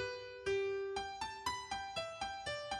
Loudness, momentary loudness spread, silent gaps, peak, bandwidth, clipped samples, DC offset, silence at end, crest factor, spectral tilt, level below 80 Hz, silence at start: -41 LUFS; 6 LU; none; -26 dBFS; 12.5 kHz; under 0.1%; under 0.1%; 0 s; 16 dB; -3 dB/octave; -64 dBFS; 0 s